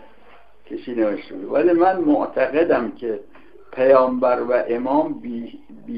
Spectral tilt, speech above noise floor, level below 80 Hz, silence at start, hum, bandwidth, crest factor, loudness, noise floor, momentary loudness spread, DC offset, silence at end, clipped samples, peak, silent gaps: -9.5 dB/octave; 32 dB; -60 dBFS; 0.7 s; none; 5.2 kHz; 18 dB; -19 LUFS; -51 dBFS; 17 LU; 0.7%; 0 s; under 0.1%; -2 dBFS; none